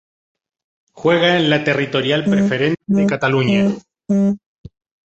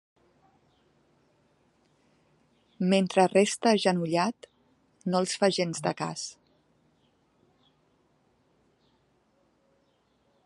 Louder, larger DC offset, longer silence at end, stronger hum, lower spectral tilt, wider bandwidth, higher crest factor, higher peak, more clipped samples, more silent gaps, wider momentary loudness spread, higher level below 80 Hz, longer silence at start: first, -16 LUFS vs -27 LUFS; neither; second, 0.7 s vs 4.15 s; neither; first, -6.5 dB/octave vs -5 dB/octave; second, 7.8 kHz vs 11.5 kHz; second, 16 dB vs 22 dB; first, -2 dBFS vs -8 dBFS; neither; neither; second, 7 LU vs 13 LU; first, -54 dBFS vs -76 dBFS; second, 0.95 s vs 2.8 s